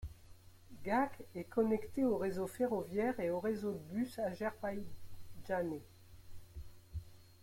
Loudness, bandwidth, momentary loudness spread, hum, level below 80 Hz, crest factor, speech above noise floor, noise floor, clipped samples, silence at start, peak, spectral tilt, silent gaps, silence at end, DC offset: -38 LUFS; 16.5 kHz; 20 LU; none; -60 dBFS; 18 dB; 21 dB; -58 dBFS; under 0.1%; 0 s; -22 dBFS; -7 dB/octave; none; 0 s; under 0.1%